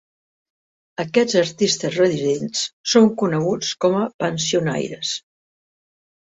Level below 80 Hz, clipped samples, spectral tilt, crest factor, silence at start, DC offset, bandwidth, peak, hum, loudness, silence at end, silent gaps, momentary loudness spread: -62 dBFS; under 0.1%; -4 dB/octave; 18 dB; 1 s; under 0.1%; 8.2 kHz; -2 dBFS; none; -20 LUFS; 1.1 s; 2.73-2.84 s, 4.14-4.19 s; 9 LU